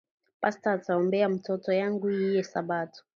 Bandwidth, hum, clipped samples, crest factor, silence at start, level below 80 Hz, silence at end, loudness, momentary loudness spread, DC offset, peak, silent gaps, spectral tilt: 7.2 kHz; none; under 0.1%; 16 dB; 0.4 s; -78 dBFS; 0.15 s; -28 LUFS; 5 LU; under 0.1%; -12 dBFS; none; -7 dB/octave